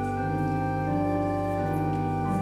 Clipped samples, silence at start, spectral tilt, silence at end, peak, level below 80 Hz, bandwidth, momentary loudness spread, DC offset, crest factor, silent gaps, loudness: under 0.1%; 0 s; -8.5 dB/octave; 0 s; -16 dBFS; -46 dBFS; 14 kHz; 1 LU; under 0.1%; 12 dB; none; -27 LUFS